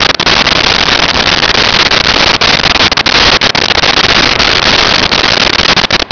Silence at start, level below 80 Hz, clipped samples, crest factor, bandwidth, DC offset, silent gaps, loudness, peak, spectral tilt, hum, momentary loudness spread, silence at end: 0 s; -26 dBFS; under 0.1%; 8 dB; 5.4 kHz; under 0.1%; none; -5 LUFS; 0 dBFS; -2 dB/octave; none; 1 LU; 0.05 s